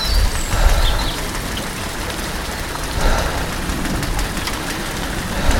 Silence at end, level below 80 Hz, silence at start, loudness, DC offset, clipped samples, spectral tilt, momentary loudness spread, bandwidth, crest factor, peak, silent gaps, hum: 0 s; -22 dBFS; 0 s; -21 LUFS; under 0.1%; under 0.1%; -3.5 dB/octave; 5 LU; 17 kHz; 16 dB; -2 dBFS; none; none